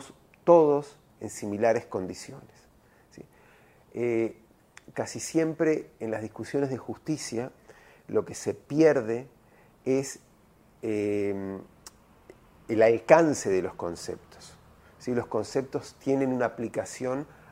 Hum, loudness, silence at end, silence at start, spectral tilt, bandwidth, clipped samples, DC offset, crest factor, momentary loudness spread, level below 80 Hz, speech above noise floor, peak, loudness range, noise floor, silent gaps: none; -28 LUFS; 0.25 s; 0 s; -5.5 dB/octave; 16 kHz; under 0.1%; under 0.1%; 26 dB; 18 LU; -64 dBFS; 33 dB; -2 dBFS; 7 LU; -59 dBFS; none